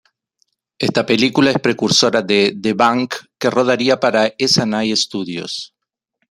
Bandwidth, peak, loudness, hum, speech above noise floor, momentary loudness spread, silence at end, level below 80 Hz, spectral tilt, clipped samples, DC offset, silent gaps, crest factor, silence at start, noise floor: 14.5 kHz; 0 dBFS; -16 LUFS; none; 57 dB; 11 LU; 0.65 s; -58 dBFS; -4 dB/octave; under 0.1%; under 0.1%; none; 18 dB; 0.8 s; -73 dBFS